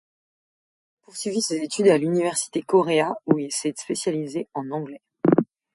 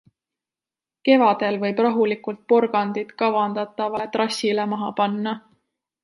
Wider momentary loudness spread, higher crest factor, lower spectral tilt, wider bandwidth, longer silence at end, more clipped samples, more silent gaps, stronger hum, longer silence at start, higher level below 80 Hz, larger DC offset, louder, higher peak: about the same, 12 LU vs 10 LU; about the same, 20 dB vs 20 dB; about the same, -4.5 dB/octave vs -5.5 dB/octave; about the same, 11.5 kHz vs 11.5 kHz; second, 0.3 s vs 0.65 s; neither; neither; neither; about the same, 1.15 s vs 1.05 s; about the same, -70 dBFS vs -72 dBFS; neither; about the same, -23 LUFS vs -22 LUFS; about the same, -4 dBFS vs -2 dBFS